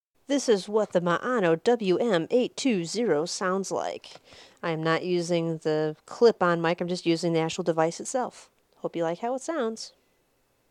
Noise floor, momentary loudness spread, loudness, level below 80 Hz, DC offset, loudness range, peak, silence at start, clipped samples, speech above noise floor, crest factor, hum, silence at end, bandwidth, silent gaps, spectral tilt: -69 dBFS; 9 LU; -26 LUFS; -76 dBFS; under 0.1%; 4 LU; -8 dBFS; 0.3 s; under 0.1%; 43 dB; 18 dB; none; 0.8 s; 12 kHz; none; -5 dB/octave